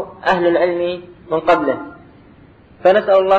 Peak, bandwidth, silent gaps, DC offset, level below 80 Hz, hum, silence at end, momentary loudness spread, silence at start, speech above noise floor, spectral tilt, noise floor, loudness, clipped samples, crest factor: -2 dBFS; 7.6 kHz; none; under 0.1%; -52 dBFS; none; 0 s; 12 LU; 0 s; 30 dB; -6.5 dB/octave; -45 dBFS; -16 LUFS; under 0.1%; 14 dB